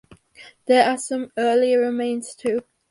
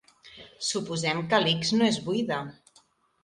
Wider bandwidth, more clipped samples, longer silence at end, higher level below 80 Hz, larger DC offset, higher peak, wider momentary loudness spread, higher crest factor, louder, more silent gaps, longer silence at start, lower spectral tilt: about the same, 11.5 kHz vs 11.5 kHz; neither; second, 0.3 s vs 0.7 s; about the same, -68 dBFS vs -66 dBFS; neither; first, -4 dBFS vs -8 dBFS; second, 9 LU vs 16 LU; about the same, 18 dB vs 22 dB; first, -21 LUFS vs -26 LUFS; neither; first, 0.4 s vs 0.25 s; about the same, -3 dB/octave vs -4 dB/octave